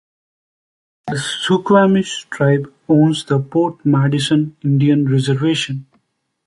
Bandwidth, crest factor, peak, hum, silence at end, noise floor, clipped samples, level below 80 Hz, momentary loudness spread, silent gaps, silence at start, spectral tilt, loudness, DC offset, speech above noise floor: 11.5 kHz; 14 dB; -2 dBFS; none; 0.65 s; -66 dBFS; under 0.1%; -56 dBFS; 10 LU; none; 1.05 s; -6.5 dB/octave; -16 LUFS; under 0.1%; 51 dB